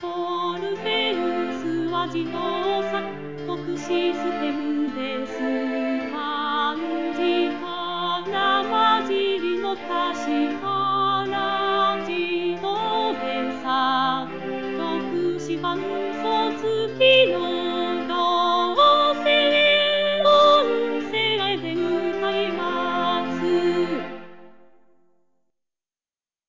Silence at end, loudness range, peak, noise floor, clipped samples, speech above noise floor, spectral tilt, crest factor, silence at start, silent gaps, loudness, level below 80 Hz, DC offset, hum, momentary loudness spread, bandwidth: 0 s; 8 LU; -6 dBFS; under -90 dBFS; under 0.1%; over 66 dB; -4.5 dB/octave; 16 dB; 0 s; none; -22 LUFS; -66 dBFS; 0.6%; none; 10 LU; 7.6 kHz